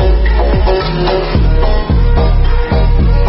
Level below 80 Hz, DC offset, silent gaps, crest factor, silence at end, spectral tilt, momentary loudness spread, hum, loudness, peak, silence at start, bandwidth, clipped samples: -10 dBFS; under 0.1%; none; 8 dB; 0 s; -6 dB/octave; 2 LU; none; -13 LUFS; -2 dBFS; 0 s; 5.8 kHz; under 0.1%